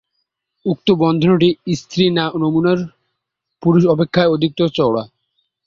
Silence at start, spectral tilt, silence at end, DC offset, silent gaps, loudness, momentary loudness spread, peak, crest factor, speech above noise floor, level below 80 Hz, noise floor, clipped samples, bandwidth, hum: 0.65 s; -7 dB/octave; 0.6 s; under 0.1%; none; -16 LUFS; 9 LU; -2 dBFS; 16 dB; 62 dB; -52 dBFS; -77 dBFS; under 0.1%; 7.4 kHz; none